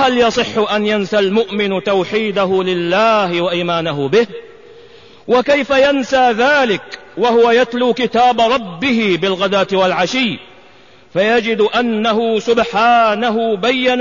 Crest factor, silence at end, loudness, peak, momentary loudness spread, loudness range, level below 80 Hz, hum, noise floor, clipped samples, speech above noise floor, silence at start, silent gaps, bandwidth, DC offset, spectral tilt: 12 dB; 0 s; -14 LUFS; -2 dBFS; 5 LU; 2 LU; -50 dBFS; none; -45 dBFS; under 0.1%; 31 dB; 0 s; none; 7.4 kHz; 0.4%; -5 dB/octave